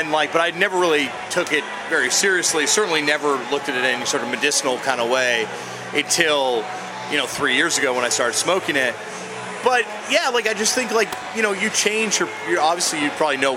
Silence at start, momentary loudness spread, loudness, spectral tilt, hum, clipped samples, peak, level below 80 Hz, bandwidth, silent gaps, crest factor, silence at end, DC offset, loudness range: 0 s; 6 LU; -19 LUFS; -1.5 dB/octave; none; under 0.1%; 0 dBFS; -66 dBFS; 17 kHz; none; 20 dB; 0 s; under 0.1%; 2 LU